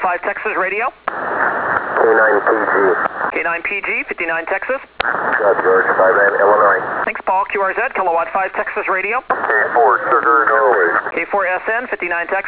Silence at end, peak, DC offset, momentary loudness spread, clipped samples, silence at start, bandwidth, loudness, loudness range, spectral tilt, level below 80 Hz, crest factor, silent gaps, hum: 0 s; 0 dBFS; under 0.1%; 8 LU; under 0.1%; 0 s; 4 kHz; -15 LUFS; 2 LU; -7.5 dB/octave; -56 dBFS; 16 dB; none; none